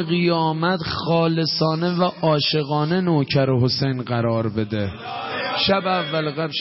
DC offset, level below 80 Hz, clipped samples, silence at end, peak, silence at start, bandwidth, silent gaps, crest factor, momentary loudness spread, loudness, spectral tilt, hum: under 0.1%; -52 dBFS; under 0.1%; 0 s; -6 dBFS; 0 s; 6 kHz; none; 14 dB; 5 LU; -21 LUFS; -8.5 dB/octave; none